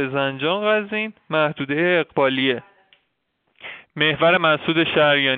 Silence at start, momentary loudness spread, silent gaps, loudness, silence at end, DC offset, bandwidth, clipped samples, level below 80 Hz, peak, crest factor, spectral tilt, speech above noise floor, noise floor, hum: 0 s; 12 LU; none; -19 LUFS; 0 s; under 0.1%; 4.7 kHz; under 0.1%; -62 dBFS; -4 dBFS; 18 dB; -2.5 dB/octave; 52 dB; -71 dBFS; none